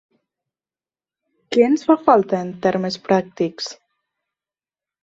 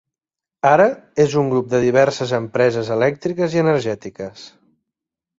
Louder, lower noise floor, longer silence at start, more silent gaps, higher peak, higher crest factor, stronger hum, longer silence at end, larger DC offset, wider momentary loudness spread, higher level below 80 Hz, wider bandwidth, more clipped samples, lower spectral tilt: about the same, -18 LUFS vs -18 LUFS; about the same, under -90 dBFS vs -88 dBFS; first, 1.5 s vs 0.65 s; neither; about the same, -2 dBFS vs -2 dBFS; about the same, 20 dB vs 18 dB; neither; first, 1.3 s vs 0.9 s; neither; about the same, 10 LU vs 12 LU; second, -64 dBFS vs -56 dBFS; about the same, 8 kHz vs 7.8 kHz; neither; about the same, -6 dB/octave vs -6 dB/octave